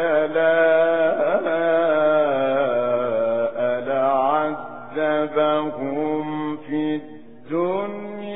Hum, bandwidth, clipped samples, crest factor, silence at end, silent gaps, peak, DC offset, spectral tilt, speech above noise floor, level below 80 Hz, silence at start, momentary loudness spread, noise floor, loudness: none; 3.9 kHz; under 0.1%; 14 dB; 0 s; none; -6 dBFS; 0.8%; -10 dB/octave; 21 dB; -64 dBFS; 0 s; 9 LU; -41 dBFS; -21 LUFS